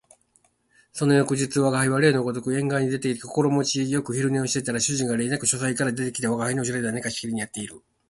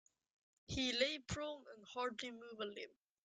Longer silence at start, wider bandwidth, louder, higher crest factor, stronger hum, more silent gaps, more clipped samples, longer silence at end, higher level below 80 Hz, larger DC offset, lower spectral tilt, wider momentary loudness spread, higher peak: first, 0.95 s vs 0.7 s; first, 11.5 kHz vs 9.6 kHz; first, -24 LUFS vs -43 LUFS; about the same, 18 dB vs 22 dB; neither; neither; neither; about the same, 0.3 s vs 0.35 s; first, -60 dBFS vs -66 dBFS; neither; about the same, -4.5 dB/octave vs -3.5 dB/octave; second, 8 LU vs 15 LU; first, -6 dBFS vs -24 dBFS